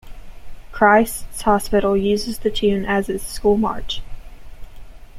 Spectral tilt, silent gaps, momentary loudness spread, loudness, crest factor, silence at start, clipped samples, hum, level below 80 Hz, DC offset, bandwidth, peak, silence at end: -4.5 dB/octave; none; 13 LU; -19 LUFS; 20 dB; 0.05 s; under 0.1%; none; -34 dBFS; under 0.1%; 15.5 kHz; 0 dBFS; 0 s